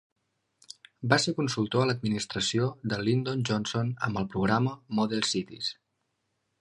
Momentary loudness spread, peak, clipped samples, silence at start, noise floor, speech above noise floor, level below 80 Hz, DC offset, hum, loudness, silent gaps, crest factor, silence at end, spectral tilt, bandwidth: 9 LU; -6 dBFS; under 0.1%; 1 s; -78 dBFS; 50 dB; -60 dBFS; under 0.1%; none; -28 LUFS; none; 24 dB; 0.85 s; -5 dB/octave; 11.5 kHz